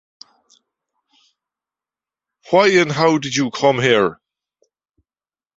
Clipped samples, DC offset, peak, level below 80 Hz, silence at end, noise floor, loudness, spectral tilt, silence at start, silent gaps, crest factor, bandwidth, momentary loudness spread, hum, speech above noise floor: under 0.1%; under 0.1%; 0 dBFS; -60 dBFS; 1.4 s; under -90 dBFS; -16 LUFS; -4.5 dB/octave; 2.5 s; none; 20 dB; 8 kHz; 6 LU; none; over 75 dB